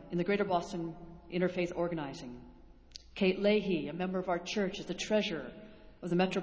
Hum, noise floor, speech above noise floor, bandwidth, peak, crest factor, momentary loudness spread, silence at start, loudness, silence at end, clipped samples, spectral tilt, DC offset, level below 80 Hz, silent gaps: none; -54 dBFS; 21 dB; 8 kHz; -16 dBFS; 18 dB; 18 LU; 0 s; -34 LUFS; 0 s; under 0.1%; -6 dB/octave; under 0.1%; -60 dBFS; none